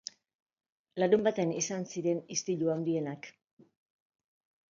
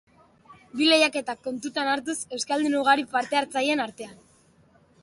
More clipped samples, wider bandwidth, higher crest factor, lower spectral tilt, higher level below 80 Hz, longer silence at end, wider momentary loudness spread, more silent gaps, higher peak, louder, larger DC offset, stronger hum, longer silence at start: neither; second, 7.6 kHz vs 11.5 kHz; about the same, 20 dB vs 20 dB; first, -4.5 dB/octave vs -2 dB/octave; second, -78 dBFS vs -70 dBFS; first, 1.4 s vs 0.9 s; first, 18 LU vs 13 LU; neither; second, -12 dBFS vs -6 dBFS; second, -31 LUFS vs -24 LUFS; neither; neither; first, 0.95 s vs 0.5 s